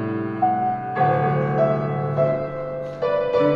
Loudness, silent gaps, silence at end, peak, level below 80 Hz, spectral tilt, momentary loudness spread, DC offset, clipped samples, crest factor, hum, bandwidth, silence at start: -22 LUFS; none; 0 s; -6 dBFS; -52 dBFS; -9.5 dB/octave; 7 LU; under 0.1%; under 0.1%; 14 dB; none; 5.8 kHz; 0 s